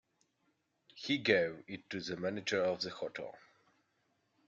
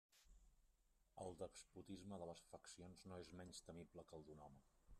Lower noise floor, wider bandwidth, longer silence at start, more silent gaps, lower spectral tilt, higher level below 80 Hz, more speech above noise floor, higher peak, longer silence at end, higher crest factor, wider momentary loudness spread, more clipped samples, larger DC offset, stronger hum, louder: about the same, -79 dBFS vs -80 dBFS; second, 7.8 kHz vs 13 kHz; first, 0.95 s vs 0.1 s; neither; about the same, -4.5 dB/octave vs -5 dB/octave; about the same, -78 dBFS vs -76 dBFS; first, 43 dB vs 22 dB; first, -12 dBFS vs -38 dBFS; first, 1.1 s vs 0 s; first, 26 dB vs 20 dB; first, 16 LU vs 7 LU; neither; neither; neither; first, -35 LUFS vs -59 LUFS